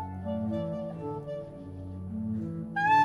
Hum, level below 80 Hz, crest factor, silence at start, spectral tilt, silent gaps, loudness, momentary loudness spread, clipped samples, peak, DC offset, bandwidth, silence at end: none; -60 dBFS; 18 dB; 0 s; -7.5 dB/octave; none; -34 LUFS; 11 LU; under 0.1%; -14 dBFS; under 0.1%; 11 kHz; 0 s